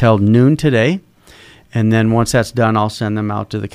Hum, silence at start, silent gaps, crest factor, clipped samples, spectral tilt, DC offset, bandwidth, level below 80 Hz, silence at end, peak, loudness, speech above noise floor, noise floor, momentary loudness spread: none; 0 s; none; 14 dB; under 0.1%; -6.5 dB/octave; under 0.1%; 14.5 kHz; -42 dBFS; 0.05 s; 0 dBFS; -15 LUFS; 30 dB; -43 dBFS; 9 LU